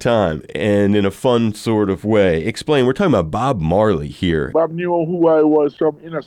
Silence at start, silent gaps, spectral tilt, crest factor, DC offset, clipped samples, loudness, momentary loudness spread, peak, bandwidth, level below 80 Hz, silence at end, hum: 0 s; none; -7 dB/octave; 12 dB; under 0.1%; under 0.1%; -17 LUFS; 5 LU; -4 dBFS; 13.5 kHz; -40 dBFS; 0.05 s; none